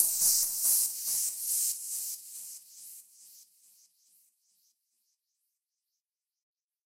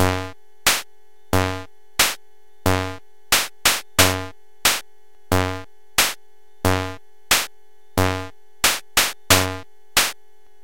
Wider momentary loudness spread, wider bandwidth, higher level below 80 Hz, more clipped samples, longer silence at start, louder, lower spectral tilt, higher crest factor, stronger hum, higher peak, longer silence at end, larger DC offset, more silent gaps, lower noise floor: first, 23 LU vs 15 LU; about the same, 16 kHz vs 17 kHz; second, -82 dBFS vs -44 dBFS; neither; about the same, 0 s vs 0 s; second, -27 LUFS vs -20 LUFS; second, 3.5 dB/octave vs -2.5 dB/octave; about the same, 26 dB vs 22 dB; neither; second, -8 dBFS vs 0 dBFS; first, 3.4 s vs 0.5 s; second, under 0.1% vs 1%; neither; first, -90 dBFS vs -59 dBFS